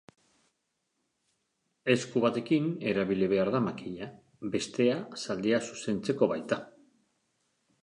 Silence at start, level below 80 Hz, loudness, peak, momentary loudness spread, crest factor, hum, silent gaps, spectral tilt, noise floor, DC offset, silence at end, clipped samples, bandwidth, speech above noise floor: 1.85 s; -68 dBFS; -30 LUFS; -10 dBFS; 9 LU; 22 dB; none; none; -5.5 dB/octave; -80 dBFS; under 0.1%; 1.15 s; under 0.1%; 11 kHz; 51 dB